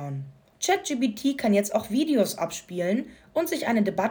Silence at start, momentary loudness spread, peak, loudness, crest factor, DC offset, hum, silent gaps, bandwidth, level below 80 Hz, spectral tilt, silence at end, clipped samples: 0 s; 8 LU; -10 dBFS; -26 LUFS; 16 dB; under 0.1%; none; none; over 20 kHz; -64 dBFS; -4.5 dB/octave; 0 s; under 0.1%